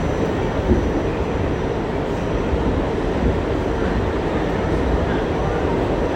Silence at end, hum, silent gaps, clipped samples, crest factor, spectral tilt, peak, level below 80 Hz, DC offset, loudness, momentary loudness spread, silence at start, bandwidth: 0 s; none; none; under 0.1%; 16 dB; -7.5 dB/octave; -4 dBFS; -26 dBFS; under 0.1%; -21 LUFS; 3 LU; 0 s; 9.8 kHz